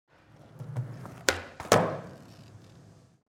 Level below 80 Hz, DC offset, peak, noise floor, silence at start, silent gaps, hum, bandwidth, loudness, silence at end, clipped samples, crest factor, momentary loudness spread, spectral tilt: -60 dBFS; under 0.1%; -2 dBFS; -55 dBFS; 0.55 s; none; none; 16.5 kHz; -30 LUFS; 0.35 s; under 0.1%; 32 dB; 25 LU; -4 dB/octave